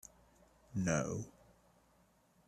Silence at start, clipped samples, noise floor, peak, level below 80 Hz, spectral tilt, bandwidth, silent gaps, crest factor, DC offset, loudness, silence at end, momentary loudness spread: 0.7 s; under 0.1%; -71 dBFS; -20 dBFS; -66 dBFS; -5.5 dB/octave; 14 kHz; none; 24 dB; under 0.1%; -39 LUFS; 1.15 s; 18 LU